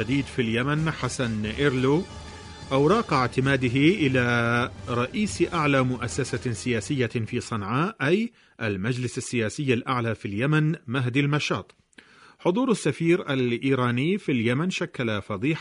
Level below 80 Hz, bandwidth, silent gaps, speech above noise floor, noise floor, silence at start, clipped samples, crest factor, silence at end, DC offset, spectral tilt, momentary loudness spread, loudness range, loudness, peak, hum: -50 dBFS; 11 kHz; none; 28 dB; -53 dBFS; 0 s; under 0.1%; 16 dB; 0 s; under 0.1%; -6 dB/octave; 7 LU; 4 LU; -25 LUFS; -8 dBFS; none